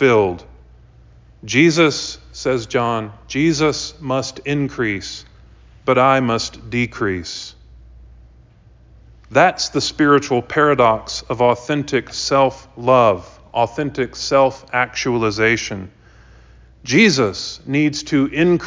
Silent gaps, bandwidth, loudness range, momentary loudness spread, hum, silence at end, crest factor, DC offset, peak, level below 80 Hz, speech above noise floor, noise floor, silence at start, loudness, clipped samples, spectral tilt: none; 7.6 kHz; 4 LU; 12 LU; none; 0 s; 18 dB; under 0.1%; 0 dBFS; -46 dBFS; 30 dB; -48 dBFS; 0 s; -17 LUFS; under 0.1%; -4.5 dB/octave